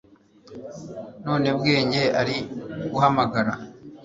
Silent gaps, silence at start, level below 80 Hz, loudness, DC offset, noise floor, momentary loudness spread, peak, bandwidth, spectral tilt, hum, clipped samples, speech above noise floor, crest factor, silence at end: none; 0.5 s; -58 dBFS; -23 LUFS; under 0.1%; -51 dBFS; 18 LU; -4 dBFS; 7.8 kHz; -6 dB/octave; none; under 0.1%; 28 dB; 20 dB; 0 s